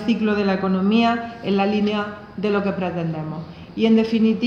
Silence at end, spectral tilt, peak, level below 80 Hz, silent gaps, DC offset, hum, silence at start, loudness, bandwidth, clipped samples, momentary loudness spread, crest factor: 0 s; -7.5 dB/octave; -6 dBFS; -54 dBFS; none; under 0.1%; none; 0 s; -21 LUFS; 6.8 kHz; under 0.1%; 12 LU; 14 dB